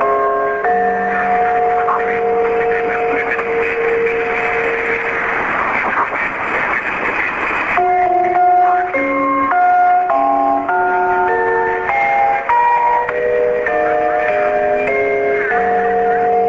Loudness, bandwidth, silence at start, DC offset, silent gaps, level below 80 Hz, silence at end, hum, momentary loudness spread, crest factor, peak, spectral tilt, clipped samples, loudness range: -15 LUFS; 7.6 kHz; 0 s; under 0.1%; none; -46 dBFS; 0 s; none; 4 LU; 12 dB; -2 dBFS; -6 dB/octave; under 0.1%; 3 LU